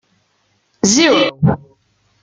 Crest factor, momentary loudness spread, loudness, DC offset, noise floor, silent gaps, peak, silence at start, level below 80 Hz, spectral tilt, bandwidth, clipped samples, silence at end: 16 dB; 7 LU; -13 LUFS; under 0.1%; -62 dBFS; none; 0 dBFS; 0.85 s; -46 dBFS; -4 dB/octave; 10 kHz; under 0.1%; 0.65 s